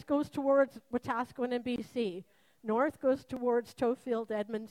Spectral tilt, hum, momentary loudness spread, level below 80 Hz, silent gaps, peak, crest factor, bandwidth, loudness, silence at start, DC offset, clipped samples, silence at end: -6.5 dB/octave; none; 7 LU; -70 dBFS; none; -16 dBFS; 16 dB; 14.5 kHz; -33 LUFS; 0 s; under 0.1%; under 0.1%; 0.05 s